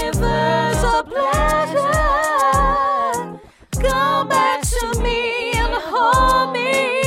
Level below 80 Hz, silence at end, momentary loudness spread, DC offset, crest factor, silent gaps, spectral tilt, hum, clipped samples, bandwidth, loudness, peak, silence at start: -26 dBFS; 0 s; 5 LU; under 0.1%; 14 dB; none; -4 dB/octave; none; under 0.1%; 16.5 kHz; -17 LUFS; -4 dBFS; 0 s